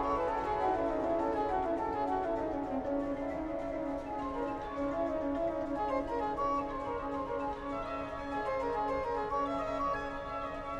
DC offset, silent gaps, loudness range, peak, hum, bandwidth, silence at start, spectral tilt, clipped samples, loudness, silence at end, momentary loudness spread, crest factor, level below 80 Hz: under 0.1%; none; 2 LU; -20 dBFS; none; 10 kHz; 0 s; -7 dB/octave; under 0.1%; -35 LUFS; 0 s; 5 LU; 14 dB; -52 dBFS